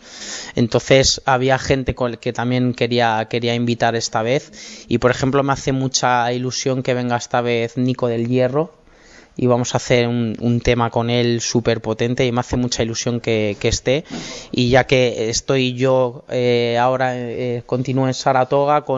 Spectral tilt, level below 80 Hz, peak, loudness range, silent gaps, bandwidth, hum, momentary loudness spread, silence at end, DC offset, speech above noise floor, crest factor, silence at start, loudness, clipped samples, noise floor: -5 dB/octave; -40 dBFS; -2 dBFS; 2 LU; none; 8 kHz; none; 6 LU; 0 s; under 0.1%; 28 dB; 16 dB; 0.05 s; -18 LUFS; under 0.1%; -46 dBFS